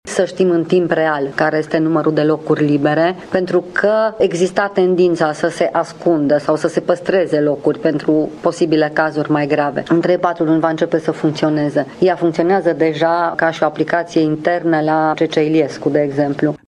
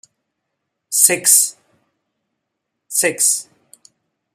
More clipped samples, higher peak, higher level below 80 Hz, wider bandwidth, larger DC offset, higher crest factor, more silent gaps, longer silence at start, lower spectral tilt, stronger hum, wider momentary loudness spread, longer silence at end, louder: neither; about the same, 0 dBFS vs 0 dBFS; first, -58 dBFS vs -76 dBFS; second, 10.5 kHz vs 16 kHz; neither; second, 14 dB vs 20 dB; neither; second, 0.05 s vs 0.9 s; first, -6.5 dB/octave vs 0 dB/octave; neither; second, 3 LU vs 10 LU; second, 0.1 s vs 0.9 s; about the same, -16 LUFS vs -14 LUFS